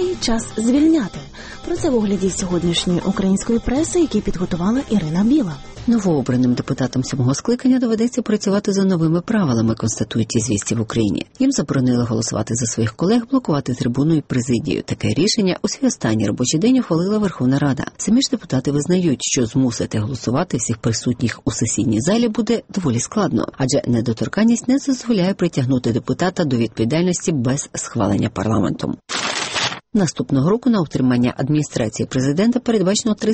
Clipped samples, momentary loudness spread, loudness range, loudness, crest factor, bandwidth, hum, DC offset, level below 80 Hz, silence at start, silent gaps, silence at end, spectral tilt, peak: under 0.1%; 5 LU; 1 LU; -19 LUFS; 14 dB; 8.8 kHz; none; under 0.1%; -42 dBFS; 0 s; none; 0 s; -5.5 dB/octave; -4 dBFS